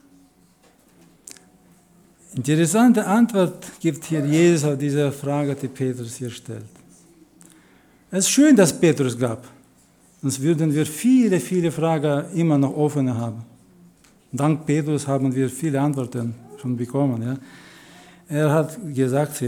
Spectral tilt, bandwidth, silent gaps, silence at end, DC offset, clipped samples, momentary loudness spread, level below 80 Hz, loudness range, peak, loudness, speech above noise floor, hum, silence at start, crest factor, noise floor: -6 dB/octave; 19 kHz; none; 0 s; under 0.1%; under 0.1%; 14 LU; -66 dBFS; 5 LU; -4 dBFS; -21 LUFS; 36 dB; none; 2.3 s; 18 dB; -56 dBFS